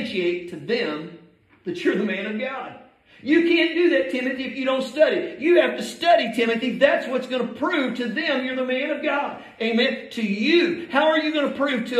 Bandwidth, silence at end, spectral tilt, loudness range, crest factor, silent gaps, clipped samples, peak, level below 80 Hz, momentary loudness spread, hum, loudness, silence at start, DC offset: 13 kHz; 0 s; -5 dB/octave; 3 LU; 18 dB; none; under 0.1%; -4 dBFS; -70 dBFS; 10 LU; none; -22 LUFS; 0 s; under 0.1%